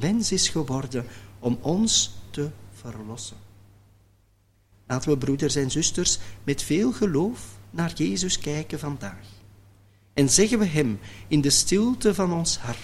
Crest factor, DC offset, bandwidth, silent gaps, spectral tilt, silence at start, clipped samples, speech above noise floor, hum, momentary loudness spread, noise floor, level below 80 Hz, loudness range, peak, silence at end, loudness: 20 dB; under 0.1%; 15.5 kHz; none; -4 dB/octave; 0 s; under 0.1%; 38 dB; none; 17 LU; -62 dBFS; -46 dBFS; 7 LU; -6 dBFS; 0 s; -24 LUFS